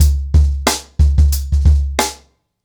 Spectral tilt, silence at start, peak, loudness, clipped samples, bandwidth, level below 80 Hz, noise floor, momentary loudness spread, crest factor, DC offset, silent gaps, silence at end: -4.5 dB/octave; 0 s; -4 dBFS; -15 LUFS; under 0.1%; 19.5 kHz; -14 dBFS; -48 dBFS; 5 LU; 10 dB; under 0.1%; none; 0.5 s